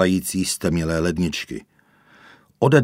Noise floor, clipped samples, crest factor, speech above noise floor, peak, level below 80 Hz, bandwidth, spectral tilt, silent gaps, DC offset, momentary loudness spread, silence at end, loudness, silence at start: -55 dBFS; under 0.1%; 22 dB; 33 dB; 0 dBFS; -44 dBFS; 16 kHz; -5.5 dB/octave; none; under 0.1%; 11 LU; 0 s; -22 LUFS; 0 s